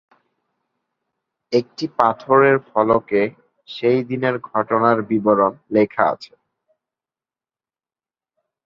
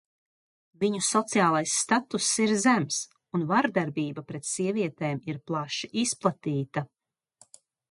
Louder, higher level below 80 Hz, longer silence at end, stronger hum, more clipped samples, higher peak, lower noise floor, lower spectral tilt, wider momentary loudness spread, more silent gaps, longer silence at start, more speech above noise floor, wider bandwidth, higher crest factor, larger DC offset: first, -18 LUFS vs -27 LUFS; first, -60 dBFS vs -72 dBFS; first, 2.4 s vs 1.05 s; neither; neither; first, 0 dBFS vs -8 dBFS; first, under -90 dBFS vs -62 dBFS; first, -7.5 dB/octave vs -4 dB/octave; about the same, 8 LU vs 10 LU; neither; first, 1.5 s vs 0.8 s; first, over 72 dB vs 35 dB; second, 7.2 kHz vs 11.5 kHz; about the same, 20 dB vs 20 dB; neither